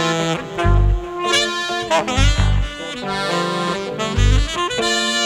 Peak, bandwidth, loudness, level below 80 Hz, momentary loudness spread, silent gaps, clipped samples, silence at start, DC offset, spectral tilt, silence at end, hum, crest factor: 0 dBFS; 13 kHz; -19 LUFS; -22 dBFS; 6 LU; none; under 0.1%; 0 s; under 0.1%; -4 dB/octave; 0 s; none; 18 dB